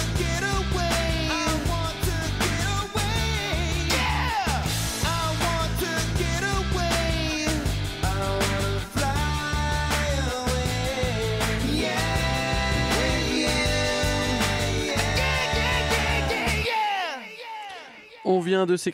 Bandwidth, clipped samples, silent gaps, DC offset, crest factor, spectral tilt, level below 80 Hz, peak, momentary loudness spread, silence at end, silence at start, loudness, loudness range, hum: 16 kHz; under 0.1%; none; under 0.1%; 14 dB; -4 dB/octave; -32 dBFS; -10 dBFS; 4 LU; 0 s; 0 s; -24 LUFS; 2 LU; none